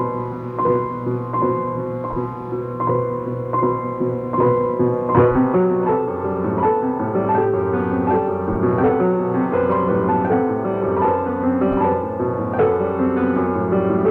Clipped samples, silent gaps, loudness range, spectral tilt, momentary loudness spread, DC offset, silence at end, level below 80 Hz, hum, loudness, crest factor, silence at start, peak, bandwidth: under 0.1%; none; 4 LU; -11 dB/octave; 7 LU; under 0.1%; 0 s; -46 dBFS; none; -19 LUFS; 16 dB; 0 s; -2 dBFS; 3.9 kHz